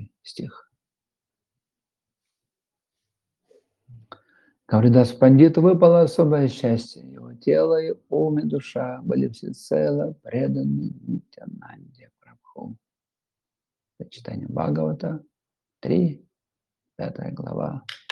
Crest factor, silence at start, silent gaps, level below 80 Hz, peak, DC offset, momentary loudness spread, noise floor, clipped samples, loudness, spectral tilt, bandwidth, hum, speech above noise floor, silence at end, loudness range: 22 dB; 0 s; none; -64 dBFS; -2 dBFS; under 0.1%; 25 LU; under -90 dBFS; under 0.1%; -21 LUFS; -9 dB/octave; 11.5 kHz; none; over 69 dB; 0.15 s; 15 LU